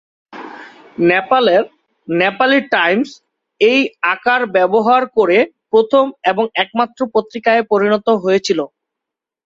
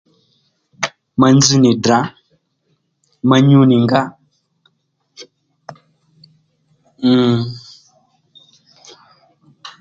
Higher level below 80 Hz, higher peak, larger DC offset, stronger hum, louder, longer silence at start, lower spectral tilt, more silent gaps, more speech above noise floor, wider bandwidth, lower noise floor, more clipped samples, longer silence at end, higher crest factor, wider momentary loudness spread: second, -62 dBFS vs -54 dBFS; about the same, -2 dBFS vs 0 dBFS; neither; neither; about the same, -14 LUFS vs -13 LUFS; second, 0.35 s vs 0.8 s; about the same, -5 dB/octave vs -5.5 dB/octave; neither; first, 69 dB vs 54 dB; about the same, 7.8 kHz vs 7.6 kHz; first, -83 dBFS vs -65 dBFS; neither; first, 0.8 s vs 0.1 s; about the same, 14 dB vs 18 dB; second, 9 LU vs 17 LU